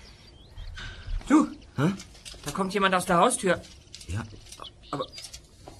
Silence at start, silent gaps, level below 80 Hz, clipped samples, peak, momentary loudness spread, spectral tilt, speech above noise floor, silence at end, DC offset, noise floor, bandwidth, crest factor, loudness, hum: 0.05 s; none; -44 dBFS; under 0.1%; -8 dBFS; 21 LU; -4.5 dB/octave; 25 dB; 0.05 s; under 0.1%; -50 dBFS; 13.5 kHz; 22 dB; -27 LUFS; none